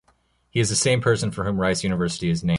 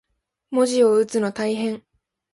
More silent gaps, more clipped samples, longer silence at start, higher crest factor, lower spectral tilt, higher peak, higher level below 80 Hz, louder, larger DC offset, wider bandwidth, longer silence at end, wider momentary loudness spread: neither; neither; about the same, 0.55 s vs 0.5 s; about the same, 16 dB vs 16 dB; about the same, -4.5 dB/octave vs -4.5 dB/octave; about the same, -8 dBFS vs -6 dBFS; first, -46 dBFS vs -66 dBFS; about the same, -22 LUFS vs -21 LUFS; neither; about the same, 11.5 kHz vs 11.5 kHz; second, 0 s vs 0.55 s; second, 5 LU vs 10 LU